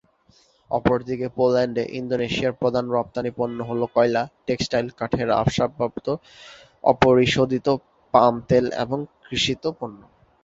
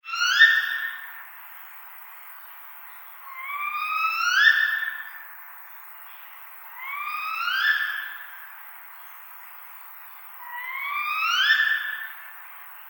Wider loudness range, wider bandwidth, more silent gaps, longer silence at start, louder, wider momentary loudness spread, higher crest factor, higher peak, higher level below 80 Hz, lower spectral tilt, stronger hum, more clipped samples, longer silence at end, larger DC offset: second, 3 LU vs 8 LU; second, 7.8 kHz vs 17 kHz; neither; first, 0.7 s vs 0.05 s; about the same, -22 LUFS vs -22 LUFS; second, 10 LU vs 23 LU; about the same, 22 dB vs 26 dB; about the same, 0 dBFS vs -2 dBFS; first, -48 dBFS vs under -90 dBFS; first, -5.5 dB/octave vs 9.5 dB/octave; neither; neither; first, 0.45 s vs 0 s; neither